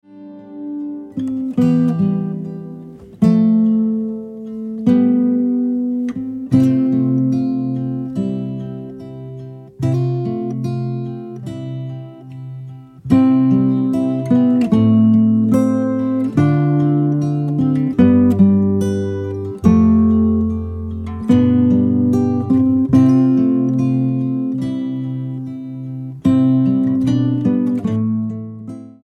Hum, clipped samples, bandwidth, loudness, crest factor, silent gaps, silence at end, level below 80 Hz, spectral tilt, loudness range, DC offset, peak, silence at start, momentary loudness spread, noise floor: none; under 0.1%; 6.4 kHz; -16 LUFS; 16 dB; none; 0.1 s; -44 dBFS; -9.5 dB/octave; 8 LU; under 0.1%; 0 dBFS; 0.1 s; 16 LU; -36 dBFS